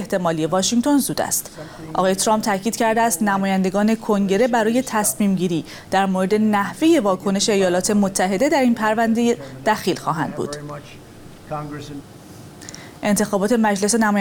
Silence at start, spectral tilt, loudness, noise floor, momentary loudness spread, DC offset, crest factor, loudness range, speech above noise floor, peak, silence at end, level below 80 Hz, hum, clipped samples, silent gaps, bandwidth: 0 s; -4.5 dB/octave; -19 LUFS; -40 dBFS; 14 LU; under 0.1%; 16 dB; 8 LU; 21 dB; -4 dBFS; 0 s; -52 dBFS; none; under 0.1%; none; 19 kHz